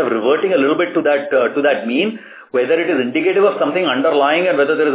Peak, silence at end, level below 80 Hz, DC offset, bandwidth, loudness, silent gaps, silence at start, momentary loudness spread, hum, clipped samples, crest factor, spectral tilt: -2 dBFS; 0 s; -76 dBFS; under 0.1%; 4 kHz; -15 LUFS; none; 0 s; 5 LU; none; under 0.1%; 12 dB; -8.5 dB/octave